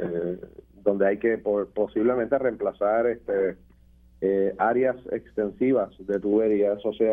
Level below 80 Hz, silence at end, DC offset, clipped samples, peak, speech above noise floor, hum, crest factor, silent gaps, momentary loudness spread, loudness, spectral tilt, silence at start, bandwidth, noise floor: -56 dBFS; 0 s; under 0.1%; under 0.1%; -6 dBFS; 31 dB; none; 18 dB; none; 7 LU; -25 LUFS; -9.5 dB/octave; 0 s; 3.7 kHz; -54 dBFS